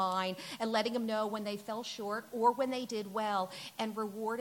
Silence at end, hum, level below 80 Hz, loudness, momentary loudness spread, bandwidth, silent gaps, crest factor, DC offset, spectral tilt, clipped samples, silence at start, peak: 0 s; none; -84 dBFS; -35 LUFS; 8 LU; 17.5 kHz; none; 18 dB; under 0.1%; -4 dB/octave; under 0.1%; 0 s; -16 dBFS